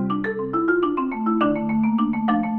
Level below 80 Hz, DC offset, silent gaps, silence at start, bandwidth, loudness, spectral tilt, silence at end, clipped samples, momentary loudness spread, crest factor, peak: -52 dBFS; under 0.1%; none; 0 s; 4.1 kHz; -22 LUFS; -10 dB/octave; 0 s; under 0.1%; 4 LU; 14 dB; -8 dBFS